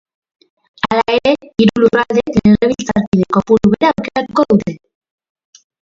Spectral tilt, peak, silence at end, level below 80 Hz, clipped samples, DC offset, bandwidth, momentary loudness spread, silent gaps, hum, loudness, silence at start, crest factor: -6.5 dB/octave; 0 dBFS; 1.1 s; -42 dBFS; under 0.1%; under 0.1%; 7.6 kHz; 6 LU; 3.07-3.12 s; none; -13 LUFS; 0.85 s; 14 dB